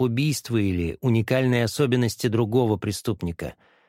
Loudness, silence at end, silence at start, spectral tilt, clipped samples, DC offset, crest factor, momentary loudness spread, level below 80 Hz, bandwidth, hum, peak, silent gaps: -24 LUFS; 0.35 s; 0 s; -6 dB/octave; under 0.1%; under 0.1%; 16 dB; 8 LU; -48 dBFS; 16 kHz; none; -8 dBFS; none